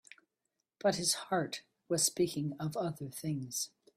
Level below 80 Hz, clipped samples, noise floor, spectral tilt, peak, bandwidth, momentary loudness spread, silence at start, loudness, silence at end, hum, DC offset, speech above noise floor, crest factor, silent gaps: -72 dBFS; under 0.1%; -86 dBFS; -3.5 dB/octave; -16 dBFS; 16 kHz; 9 LU; 0.85 s; -34 LUFS; 0.3 s; none; under 0.1%; 51 dB; 20 dB; none